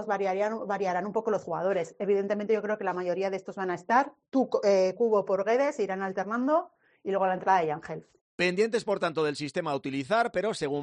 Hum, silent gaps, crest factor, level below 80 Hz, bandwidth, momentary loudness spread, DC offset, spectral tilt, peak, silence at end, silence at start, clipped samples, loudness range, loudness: none; 8.21-8.38 s; 18 dB; -72 dBFS; 10.5 kHz; 7 LU; under 0.1%; -5.5 dB/octave; -10 dBFS; 0 s; 0 s; under 0.1%; 2 LU; -28 LUFS